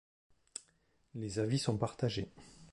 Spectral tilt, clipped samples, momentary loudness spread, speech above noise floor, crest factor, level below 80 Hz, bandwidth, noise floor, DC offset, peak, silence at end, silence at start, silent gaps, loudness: -5.5 dB/octave; under 0.1%; 16 LU; 38 dB; 20 dB; -64 dBFS; 11.5 kHz; -74 dBFS; under 0.1%; -18 dBFS; 0.05 s; 0.55 s; none; -37 LUFS